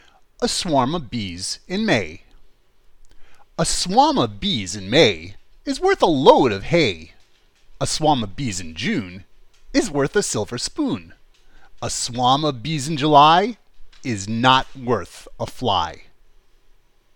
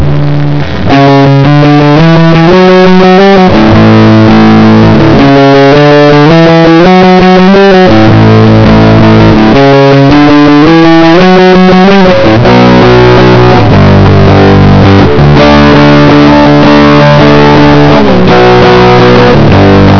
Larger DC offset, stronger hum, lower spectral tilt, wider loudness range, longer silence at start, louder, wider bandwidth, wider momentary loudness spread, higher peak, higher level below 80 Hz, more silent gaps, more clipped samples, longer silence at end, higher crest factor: second, under 0.1% vs 10%; neither; second, -4 dB/octave vs -7.5 dB/octave; first, 6 LU vs 0 LU; first, 0.4 s vs 0 s; second, -19 LUFS vs -2 LUFS; first, 19 kHz vs 5.4 kHz; first, 15 LU vs 1 LU; about the same, 0 dBFS vs 0 dBFS; second, -42 dBFS vs -20 dBFS; neither; second, under 0.1% vs 70%; first, 1.15 s vs 0 s; first, 20 dB vs 2 dB